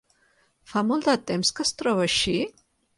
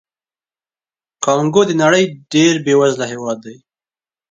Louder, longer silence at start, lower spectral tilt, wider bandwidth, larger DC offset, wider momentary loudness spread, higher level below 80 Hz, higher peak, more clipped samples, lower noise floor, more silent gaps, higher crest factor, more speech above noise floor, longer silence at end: second, -24 LUFS vs -14 LUFS; second, 0.7 s vs 1.2 s; about the same, -3.5 dB/octave vs -4.5 dB/octave; first, 11.5 kHz vs 9.4 kHz; neither; second, 6 LU vs 11 LU; first, -56 dBFS vs -62 dBFS; second, -10 dBFS vs 0 dBFS; neither; second, -65 dBFS vs under -90 dBFS; neither; about the same, 16 dB vs 16 dB; second, 41 dB vs over 76 dB; second, 0.5 s vs 0.8 s